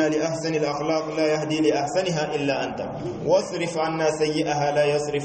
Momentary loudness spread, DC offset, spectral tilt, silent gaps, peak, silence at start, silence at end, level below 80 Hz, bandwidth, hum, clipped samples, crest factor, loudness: 5 LU; under 0.1%; -5 dB/octave; none; -8 dBFS; 0 s; 0 s; -56 dBFS; 8.8 kHz; none; under 0.1%; 16 dB; -24 LUFS